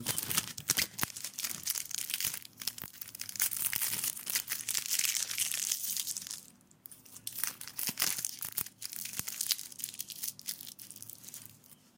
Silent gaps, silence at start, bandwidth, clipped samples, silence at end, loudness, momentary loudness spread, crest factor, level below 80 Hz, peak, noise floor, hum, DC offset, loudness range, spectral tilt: none; 0 s; 17 kHz; under 0.1%; 0.25 s; -34 LUFS; 15 LU; 30 dB; -72 dBFS; -8 dBFS; -59 dBFS; none; under 0.1%; 5 LU; 0.5 dB/octave